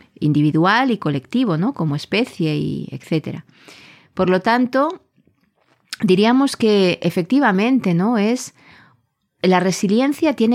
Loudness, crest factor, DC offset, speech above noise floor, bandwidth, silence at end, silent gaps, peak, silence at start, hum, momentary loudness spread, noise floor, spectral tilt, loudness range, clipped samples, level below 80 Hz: -18 LUFS; 14 dB; under 0.1%; 46 dB; 15 kHz; 0 s; none; -4 dBFS; 0.2 s; none; 9 LU; -64 dBFS; -6 dB/octave; 5 LU; under 0.1%; -60 dBFS